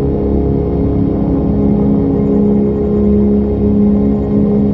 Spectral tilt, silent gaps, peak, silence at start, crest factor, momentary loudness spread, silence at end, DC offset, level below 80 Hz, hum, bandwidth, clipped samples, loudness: -12.5 dB/octave; none; -2 dBFS; 0 s; 10 dB; 3 LU; 0 s; under 0.1%; -22 dBFS; none; 3.3 kHz; under 0.1%; -13 LUFS